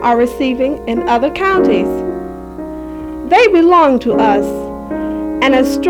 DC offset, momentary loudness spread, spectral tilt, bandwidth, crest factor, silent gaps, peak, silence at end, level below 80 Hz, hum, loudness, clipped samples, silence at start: under 0.1%; 17 LU; -5.5 dB/octave; 17.5 kHz; 12 dB; none; 0 dBFS; 0 s; -38 dBFS; none; -13 LUFS; under 0.1%; 0 s